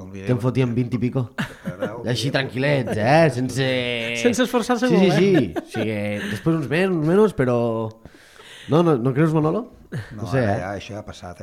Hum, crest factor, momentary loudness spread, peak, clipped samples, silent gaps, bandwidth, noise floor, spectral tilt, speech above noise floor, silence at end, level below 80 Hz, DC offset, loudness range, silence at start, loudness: none; 16 dB; 13 LU; -4 dBFS; under 0.1%; none; 15.5 kHz; -45 dBFS; -6.5 dB/octave; 25 dB; 0 s; -52 dBFS; under 0.1%; 3 LU; 0 s; -21 LUFS